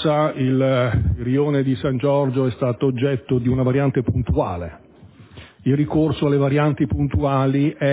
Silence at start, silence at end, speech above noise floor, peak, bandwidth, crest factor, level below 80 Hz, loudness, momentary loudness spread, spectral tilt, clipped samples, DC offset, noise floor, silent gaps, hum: 0 s; 0 s; 27 dB; -6 dBFS; 4 kHz; 14 dB; -34 dBFS; -20 LUFS; 4 LU; -12 dB/octave; under 0.1%; under 0.1%; -46 dBFS; none; none